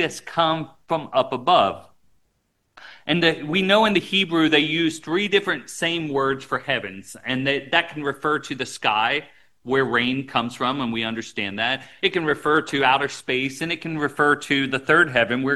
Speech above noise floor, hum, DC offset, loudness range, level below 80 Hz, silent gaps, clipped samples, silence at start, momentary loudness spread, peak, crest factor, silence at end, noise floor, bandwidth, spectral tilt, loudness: 48 dB; none; 0.2%; 4 LU; -60 dBFS; none; under 0.1%; 0 s; 9 LU; -2 dBFS; 20 dB; 0 s; -70 dBFS; 12.5 kHz; -4.5 dB/octave; -21 LUFS